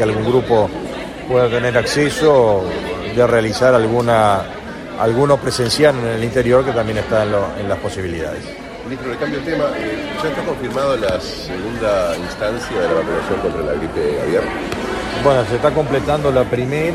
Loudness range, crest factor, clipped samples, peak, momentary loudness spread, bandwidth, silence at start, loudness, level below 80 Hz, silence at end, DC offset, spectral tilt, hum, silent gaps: 6 LU; 16 dB; under 0.1%; 0 dBFS; 10 LU; 15 kHz; 0 s; -17 LUFS; -38 dBFS; 0 s; under 0.1%; -5.5 dB/octave; none; none